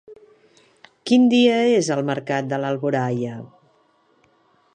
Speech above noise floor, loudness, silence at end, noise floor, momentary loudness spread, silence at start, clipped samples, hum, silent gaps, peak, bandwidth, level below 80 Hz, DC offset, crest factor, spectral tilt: 42 dB; -20 LUFS; 1.3 s; -61 dBFS; 13 LU; 0.1 s; under 0.1%; none; none; -6 dBFS; 9.6 kHz; -72 dBFS; under 0.1%; 16 dB; -5.5 dB/octave